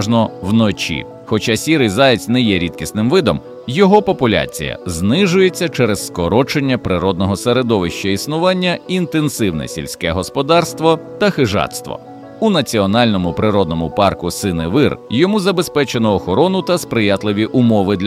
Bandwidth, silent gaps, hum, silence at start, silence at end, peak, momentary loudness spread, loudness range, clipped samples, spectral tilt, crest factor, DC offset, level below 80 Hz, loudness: 16 kHz; none; none; 0 s; 0 s; 0 dBFS; 7 LU; 2 LU; under 0.1%; -5.5 dB/octave; 14 dB; under 0.1%; -42 dBFS; -15 LUFS